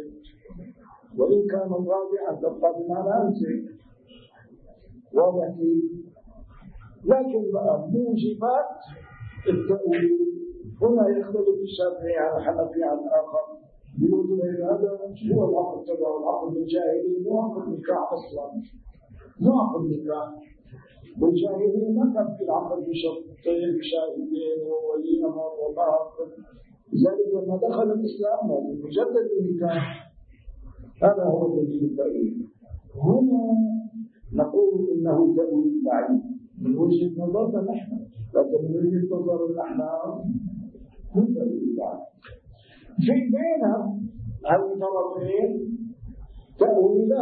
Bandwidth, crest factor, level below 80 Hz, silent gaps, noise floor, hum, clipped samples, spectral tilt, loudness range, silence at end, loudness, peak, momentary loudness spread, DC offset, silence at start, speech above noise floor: 4.7 kHz; 18 dB; -54 dBFS; none; -52 dBFS; none; under 0.1%; -12 dB/octave; 4 LU; 0 s; -24 LUFS; -6 dBFS; 13 LU; under 0.1%; 0 s; 29 dB